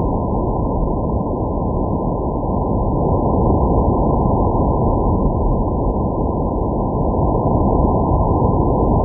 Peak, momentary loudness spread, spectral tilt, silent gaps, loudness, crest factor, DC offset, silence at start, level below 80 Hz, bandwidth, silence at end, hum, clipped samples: -2 dBFS; 4 LU; -18.5 dB/octave; none; -18 LUFS; 14 dB; under 0.1%; 0 s; -22 dBFS; 1.2 kHz; 0 s; none; under 0.1%